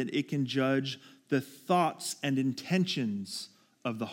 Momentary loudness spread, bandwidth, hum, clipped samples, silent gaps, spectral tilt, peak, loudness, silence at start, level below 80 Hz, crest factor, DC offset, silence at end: 11 LU; 17 kHz; none; under 0.1%; none; -5 dB/octave; -16 dBFS; -32 LUFS; 0 s; -84 dBFS; 16 dB; under 0.1%; 0 s